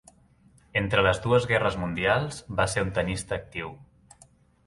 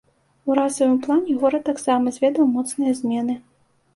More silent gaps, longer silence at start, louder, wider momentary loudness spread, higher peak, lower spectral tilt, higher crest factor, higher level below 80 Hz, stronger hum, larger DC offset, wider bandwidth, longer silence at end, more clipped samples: neither; first, 0.75 s vs 0.45 s; second, -26 LUFS vs -21 LUFS; first, 10 LU vs 6 LU; about the same, -6 dBFS vs -4 dBFS; about the same, -5 dB/octave vs -4.5 dB/octave; about the same, 20 dB vs 18 dB; first, -46 dBFS vs -64 dBFS; neither; neither; about the same, 11.5 kHz vs 11.5 kHz; first, 0.85 s vs 0.55 s; neither